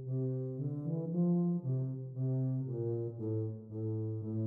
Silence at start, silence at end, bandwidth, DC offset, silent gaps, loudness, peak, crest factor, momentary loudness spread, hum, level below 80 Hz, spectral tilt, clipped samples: 0 s; 0 s; 1.5 kHz; under 0.1%; none; -36 LUFS; -24 dBFS; 12 dB; 6 LU; none; -76 dBFS; -14.5 dB/octave; under 0.1%